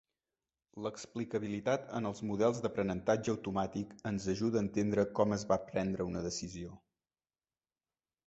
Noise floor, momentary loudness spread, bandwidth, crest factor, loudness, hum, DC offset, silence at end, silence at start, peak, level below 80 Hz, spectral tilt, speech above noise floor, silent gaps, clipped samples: under -90 dBFS; 10 LU; 8 kHz; 20 dB; -35 LUFS; none; under 0.1%; 1.5 s; 0.75 s; -16 dBFS; -62 dBFS; -6 dB/octave; over 55 dB; none; under 0.1%